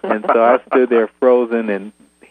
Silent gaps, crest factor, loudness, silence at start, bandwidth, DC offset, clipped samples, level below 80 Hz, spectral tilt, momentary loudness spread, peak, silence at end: none; 16 dB; -15 LUFS; 0.05 s; 9 kHz; under 0.1%; under 0.1%; -68 dBFS; -7.5 dB/octave; 8 LU; 0 dBFS; 0.4 s